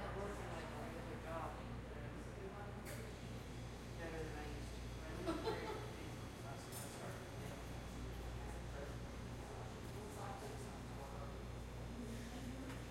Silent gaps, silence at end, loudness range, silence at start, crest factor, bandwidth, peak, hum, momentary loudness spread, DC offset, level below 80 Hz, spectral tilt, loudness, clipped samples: none; 0 s; 2 LU; 0 s; 20 dB; 16 kHz; -28 dBFS; none; 4 LU; under 0.1%; -54 dBFS; -5.5 dB/octave; -49 LUFS; under 0.1%